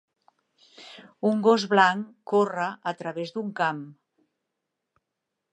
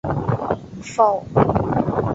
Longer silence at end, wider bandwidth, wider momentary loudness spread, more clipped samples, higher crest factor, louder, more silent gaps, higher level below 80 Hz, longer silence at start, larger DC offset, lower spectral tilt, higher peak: first, 1.6 s vs 0 s; first, 9.6 kHz vs 8 kHz; first, 23 LU vs 9 LU; neither; about the same, 22 dB vs 18 dB; second, -25 LUFS vs -20 LUFS; neither; second, -82 dBFS vs -40 dBFS; first, 0.8 s vs 0.05 s; neither; second, -5.5 dB/octave vs -8 dB/octave; about the same, -4 dBFS vs -2 dBFS